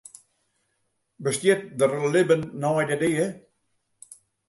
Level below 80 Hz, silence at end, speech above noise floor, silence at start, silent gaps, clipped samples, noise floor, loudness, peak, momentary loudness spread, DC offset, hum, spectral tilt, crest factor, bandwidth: -66 dBFS; 1.1 s; 51 dB; 1.2 s; none; under 0.1%; -74 dBFS; -24 LUFS; -6 dBFS; 7 LU; under 0.1%; none; -5 dB/octave; 18 dB; 12 kHz